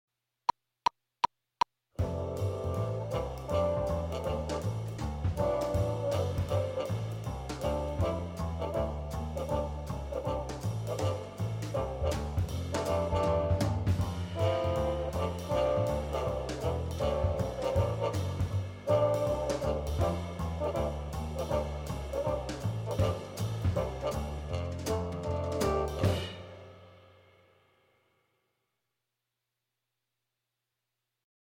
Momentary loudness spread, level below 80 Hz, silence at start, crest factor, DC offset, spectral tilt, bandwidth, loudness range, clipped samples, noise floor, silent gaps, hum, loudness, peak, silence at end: 7 LU; -42 dBFS; 1.25 s; 18 dB; under 0.1%; -6.5 dB/octave; 16.5 kHz; 4 LU; under 0.1%; -86 dBFS; none; none; -33 LUFS; -14 dBFS; 4.45 s